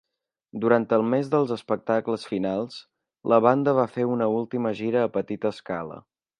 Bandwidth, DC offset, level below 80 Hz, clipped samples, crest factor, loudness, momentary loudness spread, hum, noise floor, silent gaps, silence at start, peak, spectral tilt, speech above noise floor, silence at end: 10.5 kHz; under 0.1%; -68 dBFS; under 0.1%; 20 dB; -24 LUFS; 12 LU; none; -57 dBFS; none; 0.55 s; -4 dBFS; -8 dB/octave; 33 dB; 0.4 s